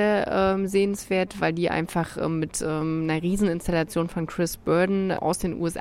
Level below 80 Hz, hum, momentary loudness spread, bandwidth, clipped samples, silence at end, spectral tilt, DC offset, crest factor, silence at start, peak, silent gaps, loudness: -46 dBFS; none; 5 LU; 16 kHz; under 0.1%; 0 s; -5.5 dB/octave; under 0.1%; 16 dB; 0 s; -8 dBFS; none; -25 LUFS